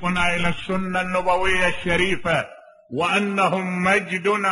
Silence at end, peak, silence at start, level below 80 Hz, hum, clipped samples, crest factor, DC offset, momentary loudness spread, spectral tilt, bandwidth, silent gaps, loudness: 0 s; -4 dBFS; 0 s; -42 dBFS; none; under 0.1%; 18 dB; under 0.1%; 5 LU; -5 dB/octave; 11.5 kHz; none; -21 LUFS